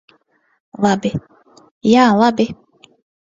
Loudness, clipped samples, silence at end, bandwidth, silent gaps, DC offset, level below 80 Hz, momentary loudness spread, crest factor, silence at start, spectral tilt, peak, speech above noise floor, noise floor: -15 LUFS; under 0.1%; 0.7 s; 7.8 kHz; 1.71-1.81 s; under 0.1%; -54 dBFS; 14 LU; 18 dB; 0.8 s; -6 dB/octave; 0 dBFS; 45 dB; -59 dBFS